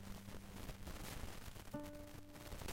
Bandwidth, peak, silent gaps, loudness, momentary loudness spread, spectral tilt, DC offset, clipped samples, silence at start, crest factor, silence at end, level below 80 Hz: 16.5 kHz; -34 dBFS; none; -53 LUFS; 5 LU; -4.5 dB/octave; under 0.1%; under 0.1%; 0 s; 16 dB; 0 s; -56 dBFS